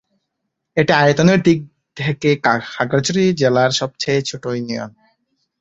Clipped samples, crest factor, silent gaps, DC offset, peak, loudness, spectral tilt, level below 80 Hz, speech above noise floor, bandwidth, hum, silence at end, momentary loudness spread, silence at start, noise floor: under 0.1%; 16 dB; none; under 0.1%; -2 dBFS; -17 LUFS; -5.5 dB/octave; -54 dBFS; 60 dB; 8 kHz; none; 0.7 s; 11 LU; 0.75 s; -76 dBFS